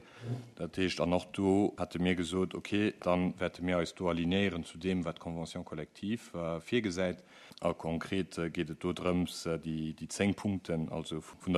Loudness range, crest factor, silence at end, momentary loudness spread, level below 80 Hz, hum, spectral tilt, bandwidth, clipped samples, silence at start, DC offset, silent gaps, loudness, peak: 4 LU; 20 dB; 0 s; 10 LU; -60 dBFS; none; -6 dB/octave; 13 kHz; under 0.1%; 0 s; under 0.1%; none; -34 LUFS; -14 dBFS